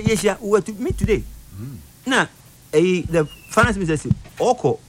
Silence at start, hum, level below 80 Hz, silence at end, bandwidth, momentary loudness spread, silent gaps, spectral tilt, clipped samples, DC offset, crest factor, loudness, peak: 0 s; none; -36 dBFS; 0.1 s; 16.5 kHz; 17 LU; none; -5.5 dB/octave; under 0.1%; under 0.1%; 16 dB; -20 LUFS; -4 dBFS